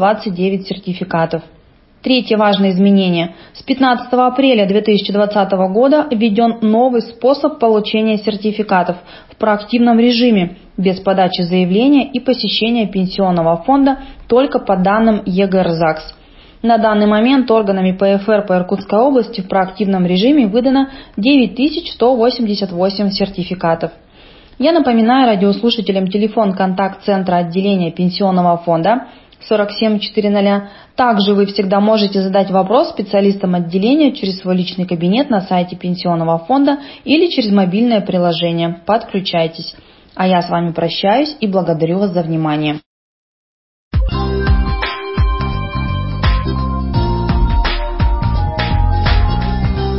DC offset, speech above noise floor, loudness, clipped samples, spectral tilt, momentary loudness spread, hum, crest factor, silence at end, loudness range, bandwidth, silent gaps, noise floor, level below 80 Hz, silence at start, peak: under 0.1%; 28 dB; -14 LUFS; under 0.1%; -11 dB/octave; 7 LU; none; 14 dB; 0 s; 4 LU; 5.8 kHz; 42.86-43.91 s; -41 dBFS; -26 dBFS; 0 s; 0 dBFS